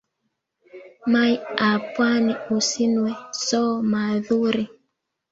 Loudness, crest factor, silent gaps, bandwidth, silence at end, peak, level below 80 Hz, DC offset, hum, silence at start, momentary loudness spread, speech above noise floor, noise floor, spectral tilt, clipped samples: -22 LUFS; 20 dB; none; 8 kHz; 0.65 s; -2 dBFS; -66 dBFS; under 0.1%; none; 0.75 s; 7 LU; 55 dB; -76 dBFS; -4 dB/octave; under 0.1%